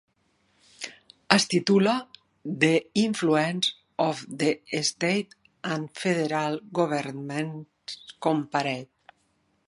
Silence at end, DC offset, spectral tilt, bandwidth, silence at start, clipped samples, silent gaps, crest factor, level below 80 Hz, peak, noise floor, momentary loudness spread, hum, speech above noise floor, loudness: 0.8 s; under 0.1%; -4.5 dB/octave; 11.5 kHz; 0.8 s; under 0.1%; none; 26 dB; -72 dBFS; 0 dBFS; -70 dBFS; 17 LU; none; 45 dB; -26 LUFS